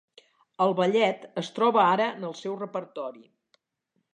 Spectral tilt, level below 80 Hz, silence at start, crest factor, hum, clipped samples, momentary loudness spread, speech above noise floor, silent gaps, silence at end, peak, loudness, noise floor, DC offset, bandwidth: -5.5 dB/octave; -84 dBFS; 0.6 s; 20 dB; none; under 0.1%; 14 LU; 51 dB; none; 0.95 s; -8 dBFS; -26 LUFS; -77 dBFS; under 0.1%; 9.8 kHz